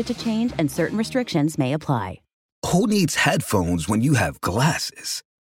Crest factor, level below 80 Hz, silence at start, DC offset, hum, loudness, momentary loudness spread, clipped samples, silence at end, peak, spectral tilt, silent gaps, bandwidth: 18 dB; -46 dBFS; 0 s; under 0.1%; none; -22 LUFS; 7 LU; under 0.1%; 0.25 s; -4 dBFS; -5 dB/octave; 2.33-2.62 s; 17 kHz